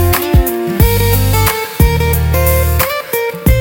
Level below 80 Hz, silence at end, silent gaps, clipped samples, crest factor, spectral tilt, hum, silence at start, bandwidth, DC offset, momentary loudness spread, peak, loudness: -18 dBFS; 0 s; none; under 0.1%; 12 dB; -5 dB/octave; none; 0 s; 17.5 kHz; under 0.1%; 3 LU; 0 dBFS; -12 LUFS